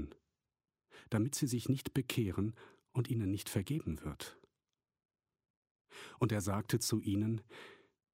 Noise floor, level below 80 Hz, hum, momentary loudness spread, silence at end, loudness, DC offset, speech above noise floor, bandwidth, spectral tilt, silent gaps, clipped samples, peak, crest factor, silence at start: under -90 dBFS; -62 dBFS; none; 18 LU; 0.4 s; -37 LUFS; under 0.1%; over 54 dB; 16 kHz; -5.5 dB/octave; 5.05-5.09 s, 5.50-5.62 s, 5.71-5.75 s, 5.81-5.85 s; under 0.1%; -16 dBFS; 22 dB; 0 s